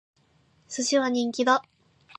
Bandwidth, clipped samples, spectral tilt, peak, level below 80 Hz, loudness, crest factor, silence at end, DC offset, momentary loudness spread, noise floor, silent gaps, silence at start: 10.5 kHz; under 0.1%; -2 dB/octave; -6 dBFS; -76 dBFS; -25 LUFS; 20 dB; 0.55 s; under 0.1%; 6 LU; -64 dBFS; none; 0.7 s